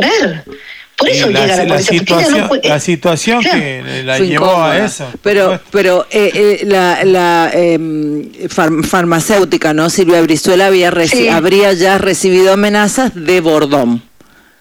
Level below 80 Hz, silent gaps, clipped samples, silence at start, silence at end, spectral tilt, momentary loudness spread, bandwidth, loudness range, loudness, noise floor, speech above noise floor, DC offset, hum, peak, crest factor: -44 dBFS; none; under 0.1%; 0 s; 0.6 s; -4 dB/octave; 8 LU; 17.5 kHz; 2 LU; -10 LUFS; -44 dBFS; 34 dB; under 0.1%; none; -2 dBFS; 10 dB